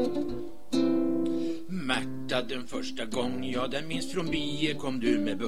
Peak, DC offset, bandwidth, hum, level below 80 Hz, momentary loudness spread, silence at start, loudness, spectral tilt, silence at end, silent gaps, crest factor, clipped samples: -10 dBFS; 2%; 15 kHz; none; -54 dBFS; 7 LU; 0 s; -31 LUFS; -5 dB/octave; 0 s; none; 20 dB; under 0.1%